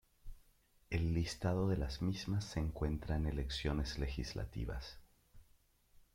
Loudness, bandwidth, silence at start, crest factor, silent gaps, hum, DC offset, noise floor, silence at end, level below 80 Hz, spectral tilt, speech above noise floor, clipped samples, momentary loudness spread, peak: -40 LUFS; 15.5 kHz; 0.25 s; 18 dB; none; none; under 0.1%; -70 dBFS; 0.75 s; -46 dBFS; -6 dB/octave; 32 dB; under 0.1%; 7 LU; -22 dBFS